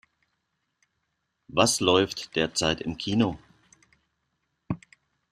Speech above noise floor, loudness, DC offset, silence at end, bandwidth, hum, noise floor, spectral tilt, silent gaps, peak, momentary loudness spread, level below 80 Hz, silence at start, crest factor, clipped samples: 53 dB; -26 LUFS; under 0.1%; 0.55 s; 14 kHz; none; -78 dBFS; -3.5 dB/octave; none; -6 dBFS; 15 LU; -58 dBFS; 1.55 s; 24 dB; under 0.1%